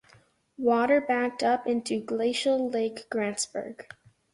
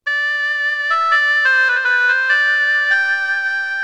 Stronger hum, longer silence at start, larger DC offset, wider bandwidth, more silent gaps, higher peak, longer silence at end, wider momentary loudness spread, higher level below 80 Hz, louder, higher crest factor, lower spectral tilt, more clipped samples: neither; first, 0.6 s vs 0.05 s; neither; about the same, 11.5 kHz vs 11 kHz; neither; second, -10 dBFS vs -4 dBFS; first, 0.5 s vs 0 s; first, 8 LU vs 5 LU; about the same, -70 dBFS vs -68 dBFS; second, -27 LUFS vs -14 LUFS; first, 18 dB vs 12 dB; first, -3.5 dB/octave vs 3 dB/octave; neither